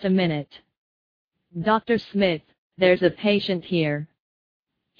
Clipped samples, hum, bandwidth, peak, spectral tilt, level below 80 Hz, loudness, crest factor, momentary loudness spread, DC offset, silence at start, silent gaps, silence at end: under 0.1%; none; 5.4 kHz; -6 dBFS; -8.5 dB/octave; -60 dBFS; -23 LUFS; 20 dB; 12 LU; under 0.1%; 0 s; 0.78-1.31 s, 2.58-2.70 s; 0.95 s